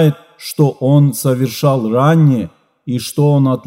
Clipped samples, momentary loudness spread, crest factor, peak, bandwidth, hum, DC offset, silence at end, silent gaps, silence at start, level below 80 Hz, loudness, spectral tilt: under 0.1%; 14 LU; 14 dB; 0 dBFS; 16 kHz; none; under 0.1%; 0.05 s; none; 0 s; -60 dBFS; -14 LUFS; -7 dB/octave